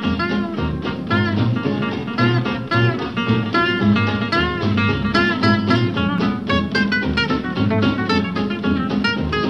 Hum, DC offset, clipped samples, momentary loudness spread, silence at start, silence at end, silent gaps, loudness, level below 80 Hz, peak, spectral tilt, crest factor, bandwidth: none; 0.3%; under 0.1%; 5 LU; 0 s; 0 s; none; -19 LUFS; -38 dBFS; -2 dBFS; -7 dB/octave; 16 dB; 8 kHz